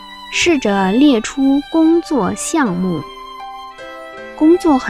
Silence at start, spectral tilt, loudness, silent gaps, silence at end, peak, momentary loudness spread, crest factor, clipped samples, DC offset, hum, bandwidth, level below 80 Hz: 0 s; -4.5 dB/octave; -14 LUFS; none; 0 s; -2 dBFS; 19 LU; 14 dB; under 0.1%; 0.2%; none; 14.5 kHz; -44 dBFS